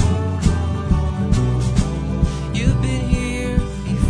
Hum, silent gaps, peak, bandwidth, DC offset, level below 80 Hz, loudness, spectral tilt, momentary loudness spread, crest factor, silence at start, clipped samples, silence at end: none; none; -2 dBFS; 10.5 kHz; under 0.1%; -24 dBFS; -20 LUFS; -6.5 dB/octave; 3 LU; 16 dB; 0 s; under 0.1%; 0 s